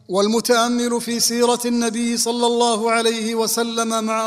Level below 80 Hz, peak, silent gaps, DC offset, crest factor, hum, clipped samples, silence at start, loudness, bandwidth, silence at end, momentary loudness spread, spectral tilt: -60 dBFS; -2 dBFS; none; under 0.1%; 16 dB; none; under 0.1%; 0.1 s; -18 LUFS; 16 kHz; 0 s; 4 LU; -2.5 dB/octave